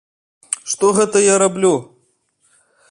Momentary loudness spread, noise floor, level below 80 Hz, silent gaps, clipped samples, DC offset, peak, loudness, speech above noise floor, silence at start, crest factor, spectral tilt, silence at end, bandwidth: 11 LU; -62 dBFS; -62 dBFS; none; under 0.1%; under 0.1%; -2 dBFS; -15 LUFS; 48 dB; 0.5 s; 16 dB; -3.5 dB/octave; 1.05 s; 11.5 kHz